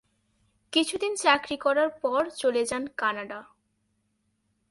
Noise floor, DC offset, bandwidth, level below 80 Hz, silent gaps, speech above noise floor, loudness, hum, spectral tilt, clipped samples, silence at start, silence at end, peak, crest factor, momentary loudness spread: -74 dBFS; under 0.1%; 11.5 kHz; -66 dBFS; none; 48 dB; -26 LUFS; none; -2 dB/octave; under 0.1%; 0.7 s; 1.25 s; -6 dBFS; 22 dB; 8 LU